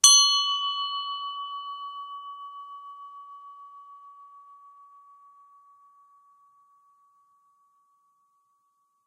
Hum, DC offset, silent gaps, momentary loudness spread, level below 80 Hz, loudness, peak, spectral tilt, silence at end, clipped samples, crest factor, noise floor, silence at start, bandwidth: none; under 0.1%; none; 27 LU; -82 dBFS; -24 LUFS; -2 dBFS; 7 dB/octave; 4.8 s; under 0.1%; 28 dB; -71 dBFS; 0.05 s; 16 kHz